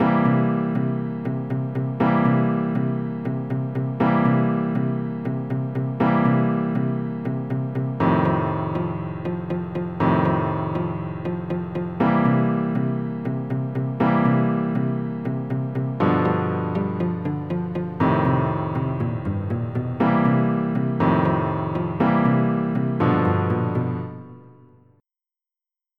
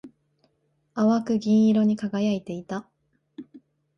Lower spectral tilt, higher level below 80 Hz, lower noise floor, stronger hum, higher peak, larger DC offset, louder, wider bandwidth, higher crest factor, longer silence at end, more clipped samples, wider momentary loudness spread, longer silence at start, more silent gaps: first, -11 dB/octave vs -7.5 dB/octave; first, -52 dBFS vs -68 dBFS; first, under -90 dBFS vs -71 dBFS; neither; first, -6 dBFS vs -12 dBFS; first, 0.2% vs under 0.1%; about the same, -23 LUFS vs -24 LUFS; second, 4.9 kHz vs 6.6 kHz; about the same, 16 dB vs 14 dB; first, 1.45 s vs 0.4 s; neither; second, 8 LU vs 17 LU; about the same, 0 s vs 0.05 s; neither